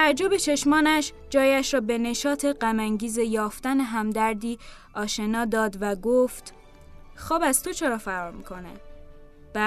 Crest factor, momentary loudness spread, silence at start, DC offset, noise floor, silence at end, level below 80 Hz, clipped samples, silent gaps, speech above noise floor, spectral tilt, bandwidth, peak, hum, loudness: 18 dB; 16 LU; 0 s; under 0.1%; -46 dBFS; 0 s; -48 dBFS; under 0.1%; none; 22 dB; -3 dB/octave; 14 kHz; -8 dBFS; none; -24 LUFS